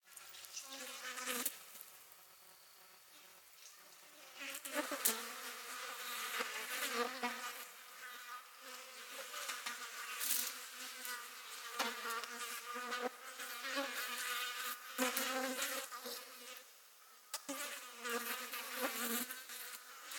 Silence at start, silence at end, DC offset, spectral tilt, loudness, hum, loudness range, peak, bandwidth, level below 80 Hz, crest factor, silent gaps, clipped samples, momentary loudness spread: 0.05 s; 0 s; under 0.1%; 1 dB/octave; -42 LUFS; none; 6 LU; -12 dBFS; 19.5 kHz; under -90 dBFS; 34 dB; none; under 0.1%; 19 LU